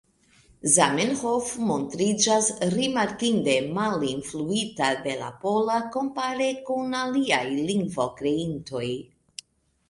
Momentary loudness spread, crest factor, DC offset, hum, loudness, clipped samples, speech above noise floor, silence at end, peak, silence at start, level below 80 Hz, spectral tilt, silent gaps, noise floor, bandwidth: 10 LU; 24 dB; under 0.1%; none; -25 LUFS; under 0.1%; 34 dB; 0.9 s; -2 dBFS; 0.65 s; -60 dBFS; -3.5 dB/octave; none; -59 dBFS; 11.5 kHz